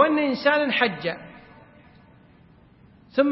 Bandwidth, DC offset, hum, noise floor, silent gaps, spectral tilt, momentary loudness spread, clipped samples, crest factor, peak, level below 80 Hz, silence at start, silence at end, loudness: 5.8 kHz; under 0.1%; none; -53 dBFS; none; -8.5 dB/octave; 15 LU; under 0.1%; 20 dB; -4 dBFS; -64 dBFS; 0 s; 0 s; -22 LUFS